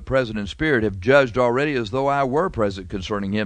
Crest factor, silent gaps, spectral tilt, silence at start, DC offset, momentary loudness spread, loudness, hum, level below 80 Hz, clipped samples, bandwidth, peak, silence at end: 18 dB; none; -6.5 dB/octave; 0 s; under 0.1%; 9 LU; -21 LUFS; none; -42 dBFS; under 0.1%; 9.6 kHz; -4 dBFS; 0 s